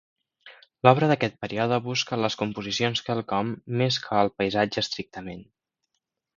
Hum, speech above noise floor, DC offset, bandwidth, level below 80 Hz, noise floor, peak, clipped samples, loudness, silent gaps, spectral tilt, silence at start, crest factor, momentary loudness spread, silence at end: none; 56 dB; under 0.1%; 7.6 kHz; -60 dBFS; -81 dBFS; 0 dBFS; under 0.1%; -25 LUFS; none; -5 dB/octave; 0.45 s; 26 dB; 10 LU; 0.95 s